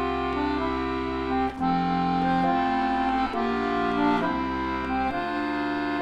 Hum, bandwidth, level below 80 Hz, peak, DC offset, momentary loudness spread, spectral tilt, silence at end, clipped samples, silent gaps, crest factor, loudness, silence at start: none; 8.8 kHz; -44 dBFS; -12 dBFS; under 0.1%; 4 LU; -7 dB/octave; 0 s; under 0.1%; none; 14 dB; -26 LUFS; 0 s